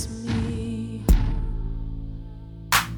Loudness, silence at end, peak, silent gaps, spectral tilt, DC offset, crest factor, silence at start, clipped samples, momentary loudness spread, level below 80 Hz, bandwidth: -27 LUFS; 0 s; -6 dBFS; none; -4.5 dB/octave; under 0.1%; 20 dB; 0 s; under 0.1%; 16 LU; -28 dBFS; 19 kHz